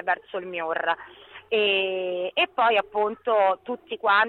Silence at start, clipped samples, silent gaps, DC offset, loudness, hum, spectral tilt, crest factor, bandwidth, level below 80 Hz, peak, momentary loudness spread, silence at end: 0 s; under 0.1%; none; under 0.1%; -24 LUFS; none; -5.5 dB/octave; 14 dB; 4.5 kHz; -70 dBFS; -10 dBFS; 10 LU; 0 s